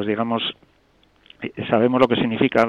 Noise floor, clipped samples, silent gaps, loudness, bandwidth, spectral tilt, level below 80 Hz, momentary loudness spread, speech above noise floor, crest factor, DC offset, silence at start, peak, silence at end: -59 dBFS; under 0.1%; none; -20 LUFS; 7.4 kHz; -7 dB/octave; -56 dBFS; 14 LU; 39 dB; 20 dB; under 0.1%; 0 s; -2 dBFS; 0 s